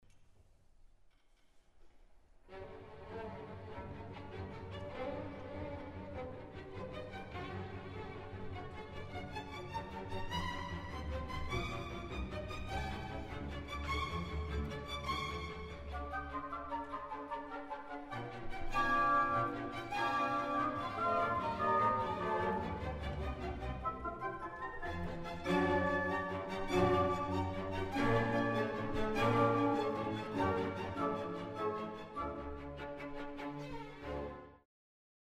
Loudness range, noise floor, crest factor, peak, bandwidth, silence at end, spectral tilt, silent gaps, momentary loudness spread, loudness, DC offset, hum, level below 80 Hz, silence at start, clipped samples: 12 LU; -66 dBFS; 20 dB; -18 dBFS; 15 kHz; 0.75 s; -6.5 dB/octave; none; 14 LU; -39 LUFS; under 0.1%; none; -50 dBFS; 0.15 s; under 0.1%